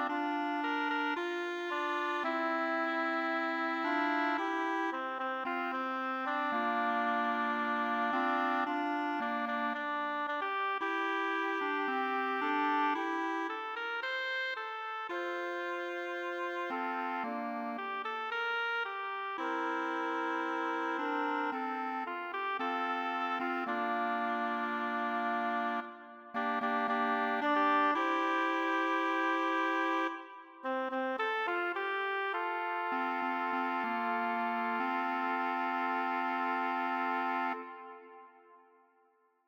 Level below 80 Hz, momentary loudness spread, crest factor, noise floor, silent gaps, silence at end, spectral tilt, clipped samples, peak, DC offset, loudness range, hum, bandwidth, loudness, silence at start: under -90 dBFS; 6 LU; 16 dB; -71 dBFS; none; 0.9 s; -3.5 dB/octave; under 0.1%; -18 dBFS; under 0.1%; 4 LU; none; over 20 kHz; -34 LUFS; 0 s